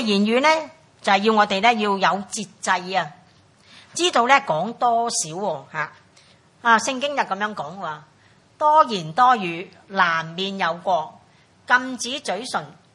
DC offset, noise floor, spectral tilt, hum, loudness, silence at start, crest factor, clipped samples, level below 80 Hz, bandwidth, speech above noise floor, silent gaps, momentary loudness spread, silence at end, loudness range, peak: under 0.1%; -55 dBFS; -3 dB/octave; none; -21 LUFS; 0 s; 22 dB; under 0.1%; -72 dBFS; 11.5 kHz; 34 dB; none; 13 LU; 0.25 s; 3 LU; 0 dBFS